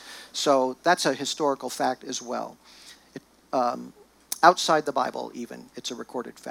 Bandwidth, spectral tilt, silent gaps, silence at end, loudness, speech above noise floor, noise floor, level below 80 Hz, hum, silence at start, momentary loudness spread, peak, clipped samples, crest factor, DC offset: 18 kHz; -2.5 dB/octave; none; 0 s; -25 LUFS; 21 dB; -46 dBFS; -72 dBFS; none; 0 s; 20 LU; -2 dBFS; under 0.1%; 26 dB; under 0.1%